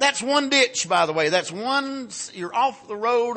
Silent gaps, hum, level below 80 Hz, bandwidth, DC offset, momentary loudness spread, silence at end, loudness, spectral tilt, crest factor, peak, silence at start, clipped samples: none; none; -72 dBFS; 8.8 kHz; under 0.1%; 12 LU; 0 s; -22 LUFS; -2 dB/octave; 18 dB; -4 dBFS; 0 s; under 0.1%